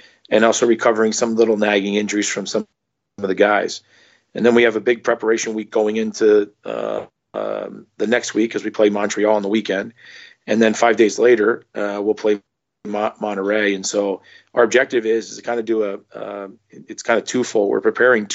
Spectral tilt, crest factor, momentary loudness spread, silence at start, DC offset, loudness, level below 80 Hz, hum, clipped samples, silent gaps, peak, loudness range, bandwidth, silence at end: -4 dB/octave; 16 dB; 14 LU; 0.3 s; under 0.1%; -18 LUFS; -68 dBFS; none; under 0.1%; none; -2 dBFS; 3 LU; 8.2 kHz; 0 s